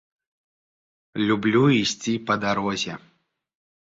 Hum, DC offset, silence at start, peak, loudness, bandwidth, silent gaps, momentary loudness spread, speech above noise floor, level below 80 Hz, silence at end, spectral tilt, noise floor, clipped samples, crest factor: none; under 0.1%; 1.15 s; -6 dBFS; -22 LUFS; 7.8 kHz; none; 12 LU; over 68 dB; -60 dBFS; 0.85 s; -5 dB/octave; under -90 dBFS; under 0.1%; 18 dB